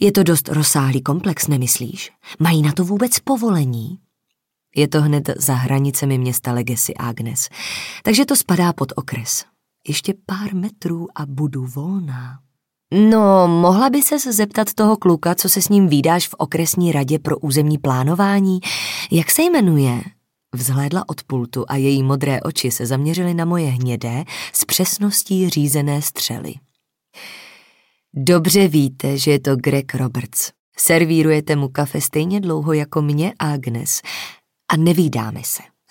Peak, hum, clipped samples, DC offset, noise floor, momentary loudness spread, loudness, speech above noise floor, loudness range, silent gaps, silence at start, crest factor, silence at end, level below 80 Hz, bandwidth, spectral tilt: 0 dBFS; none; under 0.1%; under 0.1%; -76 dBFS; 12 LU; -17 LUFS; 59 dB; 5 LU; 30.59-30.72 s; 0 s; 18 dB; 0.25 s; -60 dBFS; 17 kHz; -5 dB/octave